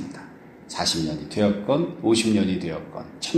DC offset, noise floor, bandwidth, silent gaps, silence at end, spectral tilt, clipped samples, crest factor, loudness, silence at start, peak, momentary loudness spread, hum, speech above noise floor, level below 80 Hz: under 0.1%; -44 dBFS; 13.5 kHz; none; 0 s; -4.5 dB/octave; under 0.1%; 18 dB; -23 LUFS; 0 s; -8 dBFS; 17 LU; none; 21 dB; -54 dBFS